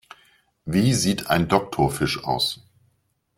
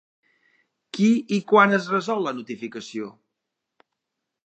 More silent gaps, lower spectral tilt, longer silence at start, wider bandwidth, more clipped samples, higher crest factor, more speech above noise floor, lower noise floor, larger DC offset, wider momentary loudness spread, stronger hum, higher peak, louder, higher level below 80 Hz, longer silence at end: neither; second, -4.5 dB/octave vs -6 dB/octave; second, 0.65 s vs 0.95 s; first, 16.5 kHz vs 8.6 kHz; neither; about the same, 20 dB vs 22 dB; second, 47 dB vs 61 dB; second, -68 dBFS vs -83 dBFS; neither; second, 5 LU vs 17 LU; neither; about the same, -4 dBFS vs -2 dBFS; about the same, -22 LUFS vs -22 LUFS; first, -48 dBFS vs -78 dBFS; second, 0.85 s vs 1.35 s